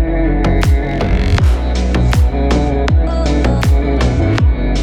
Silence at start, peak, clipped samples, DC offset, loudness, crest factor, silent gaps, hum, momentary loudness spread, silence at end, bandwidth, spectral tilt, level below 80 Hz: 0 s; 0 dBFS; under 0.1%; under 0.1%; -14 LUFS; 12 dB; none; none; 2 LU; 0 s; 11 kHz; -7 dB/octave; -14 dBFS